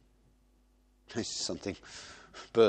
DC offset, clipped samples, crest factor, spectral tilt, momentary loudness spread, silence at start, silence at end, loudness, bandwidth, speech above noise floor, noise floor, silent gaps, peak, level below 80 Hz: under 0.1%; under 0.1%; 22 dB; -3.5 dB/octave; 14 LU; 1.1 s; 0 s; -38 LUFS; 9.4 kHz; 35 dB; -67 dBFS; none; -12 dBFS; -66 dBFS